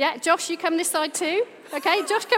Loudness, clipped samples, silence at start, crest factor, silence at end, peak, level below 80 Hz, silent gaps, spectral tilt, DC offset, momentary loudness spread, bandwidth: -23 LUFS; under 0.1%; 0 s; 18 dB; 0 s; -6 dBFS; -88 dBFS; none; -0.5 dB/octave; under 0.1%; 5 LU; 16.5 kHz